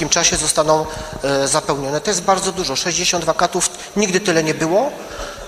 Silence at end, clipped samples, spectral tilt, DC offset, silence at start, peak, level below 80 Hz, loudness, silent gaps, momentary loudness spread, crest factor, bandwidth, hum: 0 s; under 0.1%; -2.5 dB/octave; under 0.1%; 0 s; 0 dBFS; -42 dBFS; -17 LUFS; none; 6 LU; 18 dB; 14.5 kHz; none